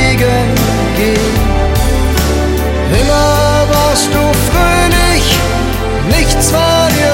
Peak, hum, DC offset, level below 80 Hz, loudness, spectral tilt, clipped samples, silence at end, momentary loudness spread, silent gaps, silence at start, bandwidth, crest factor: 0 dBFS; none; under 0.1%; -16 dBFS; -11 LUFS; -4.5 dB/octave; under 0.1%; 0 s; 4 LU; none; 0 s; 17 kHz; 10 dB